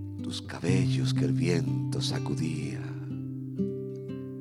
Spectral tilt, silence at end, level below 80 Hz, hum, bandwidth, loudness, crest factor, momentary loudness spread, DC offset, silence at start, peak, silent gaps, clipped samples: -6.5 dB/octave; 0 s; -60 dBFS; none; 11.5 kHz; -30 LUFS; 18 dB; 10 LU; under 0.1%; 0 s; -12 dBFS; none; under 0.1%